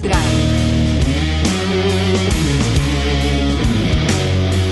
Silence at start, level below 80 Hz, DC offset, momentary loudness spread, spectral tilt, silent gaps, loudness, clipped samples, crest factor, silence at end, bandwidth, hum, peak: 0 s; -22 dBFS; under 0.1%; 1 LU; -5.5 dB/octave; none; -16 LUFS; under 0.1%; 12 dB; 0 s; 12 kHz; none; -4 dBFS